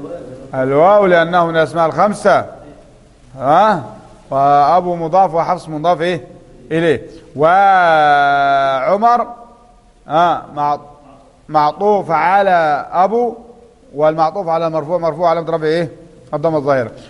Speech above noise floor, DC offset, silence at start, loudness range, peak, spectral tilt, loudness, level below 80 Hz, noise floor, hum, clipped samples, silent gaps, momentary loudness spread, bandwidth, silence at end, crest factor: 33 dB; under 0.1%; 0 s; 4 LU; 0 dBFS; -6.5 dB/octave; -14 LUFS; -50 dBFS; -46 dBFS; none; under 0.1%; none; 11 LU; 11.5 kHz; 0.05 s; 14 dB